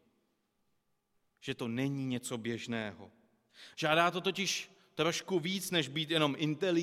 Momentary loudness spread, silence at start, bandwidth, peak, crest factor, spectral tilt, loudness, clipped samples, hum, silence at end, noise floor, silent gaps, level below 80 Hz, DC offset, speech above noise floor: 11 LU; 1.45 s; 16 kHz; -14 dBFS; 22 dB; -4 dB/octave; -34 LUFS; under 0.1%; none; 0 s; -78 dBFS; none; -76 dBFS; under 0.1%; 45 dB